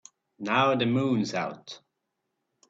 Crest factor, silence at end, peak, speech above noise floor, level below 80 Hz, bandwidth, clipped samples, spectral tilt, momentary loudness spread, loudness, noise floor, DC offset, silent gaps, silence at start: 18 dB; 0.95 s; -12 dBFS; 55 dB; -68 dBFS; 7.8 kHz; under 0.1%; -5.5 dB/octave; 20 LU; -26 LUFS; -81 dBFS; under 0.1%; none; 0.4 s